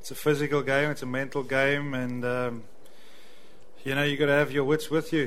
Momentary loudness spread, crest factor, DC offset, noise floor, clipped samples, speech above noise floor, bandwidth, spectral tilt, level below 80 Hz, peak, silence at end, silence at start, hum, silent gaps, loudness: 8 LU; 18 dB; 1%; -55 dBFS; under 0.1%; 28 dB; 16 kHz; -5.5 dB/octave; -60 dBFS; -10 dBFS; 0 s; 0.05 s; none; none; -27 LUFS